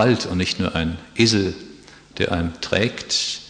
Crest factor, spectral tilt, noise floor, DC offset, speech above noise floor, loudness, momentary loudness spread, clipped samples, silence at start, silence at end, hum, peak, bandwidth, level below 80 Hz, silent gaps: 18 dB; -4.5 dB/octave; -44 dBFS; under 0.1%; 23 dB; -21 LUFS; 10 LU; under 0.1%; 0 s; 0 s; none; -4 dBFS; 10.5 kHz; -44 dBFS; none